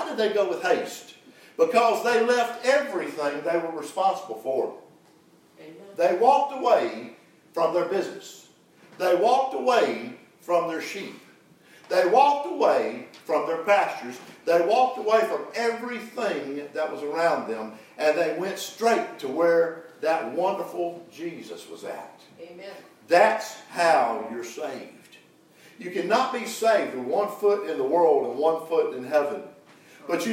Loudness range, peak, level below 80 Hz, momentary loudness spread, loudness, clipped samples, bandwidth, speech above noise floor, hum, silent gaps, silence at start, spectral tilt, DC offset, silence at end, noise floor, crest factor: 4 LU; -4 dBFS; -88 dBFS; 17 LU; -24 LUFS; under 0.1%; 16 kHz; 33 dB; none; none; 0 s; -4 dB/octave; under 0.1%; 0 s; -57 dBFS; 20 dB